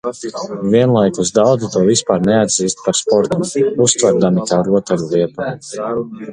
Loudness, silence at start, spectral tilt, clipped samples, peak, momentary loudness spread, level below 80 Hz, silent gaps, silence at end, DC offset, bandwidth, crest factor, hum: -15 LUFS; 0.05 s; -4.5 dB/octave; under 0.1%; 0 dBFS; 10 LU; -50 dBFS; none; 0 s; under 0.1%; 11 kHz; 14 dB; none